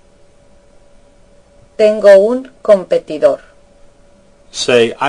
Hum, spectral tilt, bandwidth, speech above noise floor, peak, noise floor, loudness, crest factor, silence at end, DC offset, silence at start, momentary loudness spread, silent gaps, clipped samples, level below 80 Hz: none; -4 dB/octave; 10.5 kHz; 35 dB; 0 dBFS; -46 dBFS; -12 LUFS; 14 dB; 0 s; under 0.1%; 1.8 s; 15 LU; none; 1%; -50 dBFS